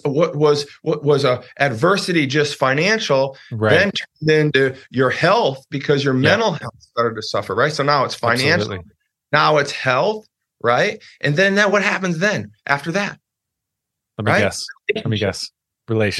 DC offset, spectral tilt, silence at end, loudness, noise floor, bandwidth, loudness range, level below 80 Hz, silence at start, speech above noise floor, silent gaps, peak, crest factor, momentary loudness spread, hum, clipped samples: under 0.1%; -5 dB/octave; 0 s; -18 LUFS; -81 dBFS; 12.5 kHz; 4 LU; -60 dBFS; 0.05 s; 63 dB; none; 0 dBFS; 18 dB; 9 LU; none; under 0.1%